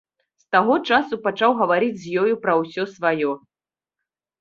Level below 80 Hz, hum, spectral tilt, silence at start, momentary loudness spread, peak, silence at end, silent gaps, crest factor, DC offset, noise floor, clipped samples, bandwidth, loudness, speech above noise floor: -66 dBFS; none; -6 dB/octave; 0.5 s; 7 LU; -2 dBFS; 1.05 s; none; 20 dB; under 0.1%; under -90 dBFS; under 0.1%; 7.4 kHz; -20 LUFS; over 70 dB